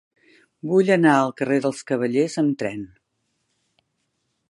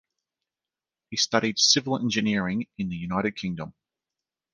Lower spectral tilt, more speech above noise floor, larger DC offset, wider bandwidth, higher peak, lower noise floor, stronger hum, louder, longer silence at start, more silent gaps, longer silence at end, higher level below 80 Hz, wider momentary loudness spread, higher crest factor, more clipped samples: first, -6.5 dB/octave vs -3 dB/octave; second, 53 dB vs over 64 dB; neither; about the same, 11.5 kHz vs 10.5 kHz; about the same, -2 dBFS vs -4 dBFS; second, -73 dBFS vs under -90 dBFS; neither; first, -21 LUFS vs -25 LUFS; second, 0.65 s vs 1.1 s; neither; first, 1.65 s vs 0.85 s; second, -68 dBFS vs -58 dBFS; first, 16 LU vs 13 LU; about the same, 20 dB vs 24 dB; neither